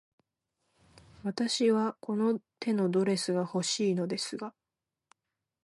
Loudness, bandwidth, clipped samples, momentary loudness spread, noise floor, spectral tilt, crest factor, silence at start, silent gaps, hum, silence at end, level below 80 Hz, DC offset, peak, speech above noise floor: -30 LUFS; 11.5 kHz; under 0.1%; 10 LU; -89 dBFS; -5 dB/octave; 16 dB; 1.25 s; none; none; 1.15 s; -76 dBFS; under 0.1%; -16 dBFS; 60 dB